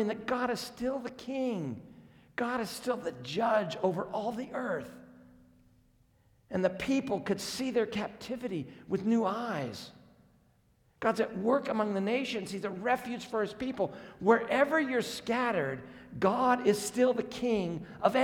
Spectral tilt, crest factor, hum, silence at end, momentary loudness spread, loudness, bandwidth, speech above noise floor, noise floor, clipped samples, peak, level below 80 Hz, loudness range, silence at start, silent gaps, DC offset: -5 dB/octave; 22 dB; none; 0 s; 11 LU; -32 LUFS; 18.5 kHz; 36 dB; -68 dBFS; under 0.1%; -10 dBFS; -66 dBFS; 6 LU; 0 s; none; under 0.1%